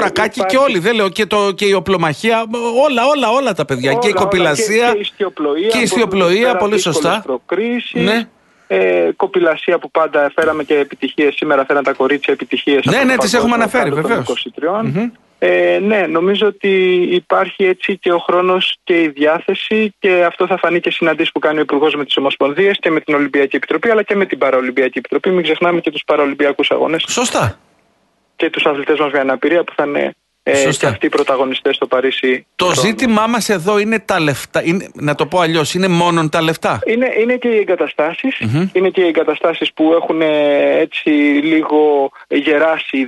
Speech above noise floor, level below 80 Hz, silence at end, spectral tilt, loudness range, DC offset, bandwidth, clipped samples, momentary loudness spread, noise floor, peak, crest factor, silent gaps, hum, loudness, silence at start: 45 dB; -54 dBFS; 0 s; -4.5 dB/octave; 2 LU; under 0.1%; 12 kHz; under 0.1%; 5 LU; -59 dBFS; -2 dBFS; 12 dB; none; none; -14 LUFS; 0 s